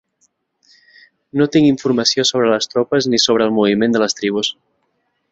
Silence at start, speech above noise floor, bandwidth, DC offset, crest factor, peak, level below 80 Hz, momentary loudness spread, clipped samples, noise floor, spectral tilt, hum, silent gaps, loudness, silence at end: 1.35 s; 52 dB; 8 kHz; under 0.1%; 16 dB; -2 dBFS; -58 dBFS; 5 LU; under 0.1%; -67 dBFS; -4 dB/octave; none; none; -15 LUFS; 0.8 s